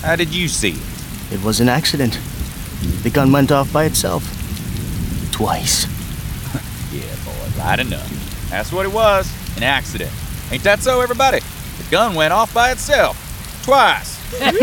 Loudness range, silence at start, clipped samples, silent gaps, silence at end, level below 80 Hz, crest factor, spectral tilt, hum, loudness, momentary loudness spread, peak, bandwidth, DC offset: 5 LU; 0 s; under 0.1%; none; 0 s; -30 dBFS; 16 dB; -4 dB/octave; none; -17 LUFS; 13 LU; -2 dBFS; 19.5 kHz; under 0.1%